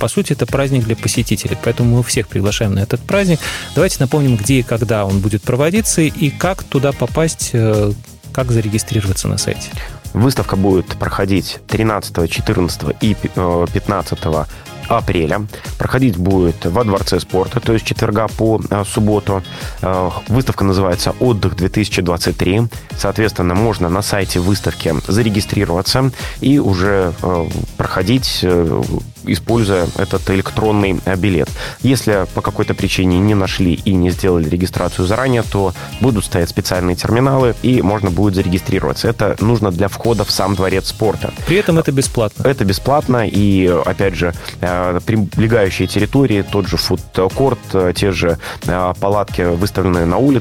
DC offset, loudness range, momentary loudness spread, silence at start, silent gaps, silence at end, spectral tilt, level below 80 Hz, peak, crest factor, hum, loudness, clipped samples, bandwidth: 0.2%; 2 LU; 5 LU; 0 s; none; 0 s; -5.5 dB/octave; -32 dBFS; 0 dBFS; 14 dB; none; -15 LUFS; under 0.1%; 16.5 kHz